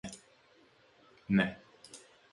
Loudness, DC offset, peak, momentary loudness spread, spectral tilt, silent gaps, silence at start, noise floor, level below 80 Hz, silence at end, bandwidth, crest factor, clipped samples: -32 LUFS; under 0.1%; -14 dBFS; 23 LU; -6 dB/octave; none; 0.05 s; -65 dBFS; -66 dBFS; 0.35 s; 11.5 kHz; 24 dB; under 0.1%